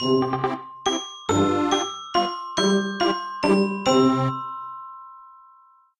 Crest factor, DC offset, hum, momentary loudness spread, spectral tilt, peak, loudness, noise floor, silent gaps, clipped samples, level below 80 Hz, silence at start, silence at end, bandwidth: 16 dB; under 0.1%; none; 14 LU; -4.5 dB/octave; -6 dBFS; -23 LUFS; -55 dBFS; none; under 0.1%; -58 dBFS; 0 s; 0.7 s; 11.5 kHz